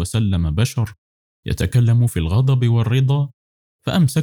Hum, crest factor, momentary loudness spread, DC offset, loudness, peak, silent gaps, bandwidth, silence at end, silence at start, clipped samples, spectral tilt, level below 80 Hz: none; 10 dB; 11 LU; under 0.1%; -18 LUFS; -8 dBFS; 0.98-1.43 s, 3.34-3.79 s; 16.5 kHz; 0 s; 0 s; under 0.1%; -6.5 dB/octave; -38 dBFS